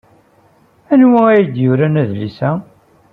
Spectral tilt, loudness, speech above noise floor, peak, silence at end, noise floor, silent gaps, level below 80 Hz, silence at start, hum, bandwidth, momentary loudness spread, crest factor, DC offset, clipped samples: -10.5 dB/octave; -13 LUFS; 39 dB; 0 dBFS; 0.5 s; -51 dBFS; none; -56 dBFS; 0.9 s; none; 5 kHz; 11 LU; 14 dB; under 0.1%; under 0.1%